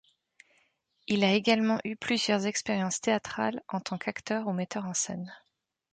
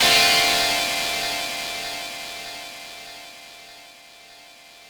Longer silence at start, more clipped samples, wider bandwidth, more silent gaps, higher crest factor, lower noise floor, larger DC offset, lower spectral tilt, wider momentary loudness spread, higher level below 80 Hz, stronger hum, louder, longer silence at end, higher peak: first, 1.1 s vs 0 s; neither; second, 9.4 kHz vs over 20 kHz; neither; about the same, 20 dB vs 20 dB; first, -71 dBFS vs -47 dBFS; neither; first, -4 dB/octave vs 0 dB/octave; second, 10 LU vs 25 LU; second, -70 dBFS vs -54 dBFS; neither; second, -29 LUFS vs -20 LUFS; first, 0.55 s vs 0 s; second, -12 dBFS vs -6 dBFS